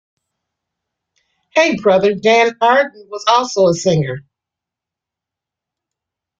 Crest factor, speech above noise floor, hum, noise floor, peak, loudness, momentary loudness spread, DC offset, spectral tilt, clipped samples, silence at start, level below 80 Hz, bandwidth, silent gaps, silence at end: 18 dB; 71 dB; none; -85 dBFS; 0 dBFS; -14 LUFS; 8 LU; under 0.1%; -4.5 dB/octave; under 0.1%; 1.55 s; -58 dBFS; 7.8 kHz; none; 2.2 s